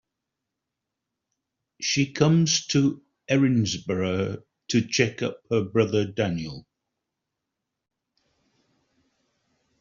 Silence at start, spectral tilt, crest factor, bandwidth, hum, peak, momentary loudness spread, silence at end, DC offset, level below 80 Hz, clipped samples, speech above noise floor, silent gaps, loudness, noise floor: 1.8 s; -5.5 dB/octave; 22 dB; 7.4 kHz; none; -4 dBFS; 11 LU; 3.2 s; under 0.1%; -62 dBFS; under 0.1%; 61 dB; none; -24 LUFS; -84 dBFS